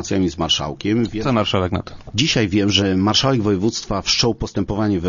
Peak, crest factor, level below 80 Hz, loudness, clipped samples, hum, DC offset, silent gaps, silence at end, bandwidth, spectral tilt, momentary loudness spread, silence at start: 0 dBFS; 18 dB; -38 dBFS; -18 LUFS; under 0.1%; none; under 0.1%; none; 0 s; 7.4 kHz; -4.5 dB/octave; 6 LU; 0 s